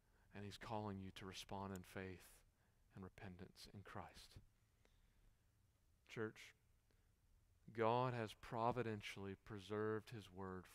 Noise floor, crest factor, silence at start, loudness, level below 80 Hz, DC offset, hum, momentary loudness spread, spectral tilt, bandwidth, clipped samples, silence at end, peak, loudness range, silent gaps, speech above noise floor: -79 dBFS; 24 dB; 0.35 s; -49 LUFS; -74 dBFS; under 0.1%; none; 19 LU; -6 dB/octave; 15.5 kHz; under 0.1%; 0 s; -26 dBFS; 15 LU; none; 30 dB